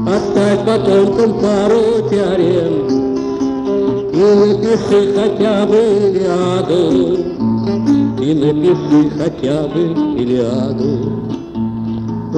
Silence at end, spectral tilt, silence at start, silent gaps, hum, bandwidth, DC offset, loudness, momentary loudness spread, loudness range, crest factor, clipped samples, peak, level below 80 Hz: 0 s; -7.5 dB/octave; 0 s; none; none; 10 kHz; under 0.1%; -14 LUFS; 6 LU; 2 LU; 12 dB; under 0.1%; -2 dBFS; -42 dBFS